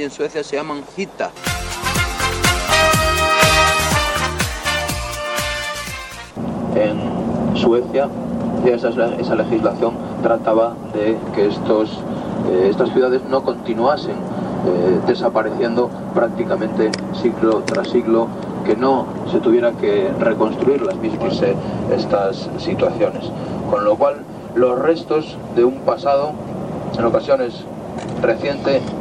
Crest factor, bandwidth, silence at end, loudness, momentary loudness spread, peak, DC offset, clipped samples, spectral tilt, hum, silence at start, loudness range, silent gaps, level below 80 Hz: 18 dB; 17 kHz; 0 s; -18 LUFS; 9 LU; 0 dBFS; under 0.1%; under 0.1%; -5 dB/octave; none; 0 s; 4 LU; none; -38 dBFS